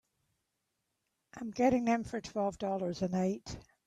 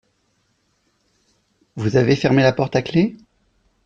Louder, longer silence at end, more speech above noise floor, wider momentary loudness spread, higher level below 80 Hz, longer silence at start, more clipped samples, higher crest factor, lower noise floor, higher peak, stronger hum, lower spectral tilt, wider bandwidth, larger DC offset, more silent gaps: second, -34 LUFS vs -18 LUFS; second, 0.25 s vs 0.7 s; about the same, 51 dB vs 49 dB; first, 13 LU vs 9 LU; second, -62 dBFS vs -52 dBFS; second, 1.35 s vs 1.75 s; neither; about the same, 18 dB vs 18 dB; first, -84 dBFS vs -66 dBFS; second, -18 dBFS vs -4 dBFS; neither; about the same, -6.5 dB/octave vs -7 dB/octave; first, 12 kHz vs 7.6 kHz; neither; neither